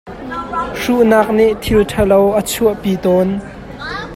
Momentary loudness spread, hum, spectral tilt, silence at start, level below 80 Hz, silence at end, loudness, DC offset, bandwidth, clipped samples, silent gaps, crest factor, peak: 14 LU; none; -5.5 dB/octave; 0.05 s; -34 dBFS; 0 s; -14 LUFS; under 0.1%; 16.5 kHz; under 0.1%; none; 14 dB; 0 dBFS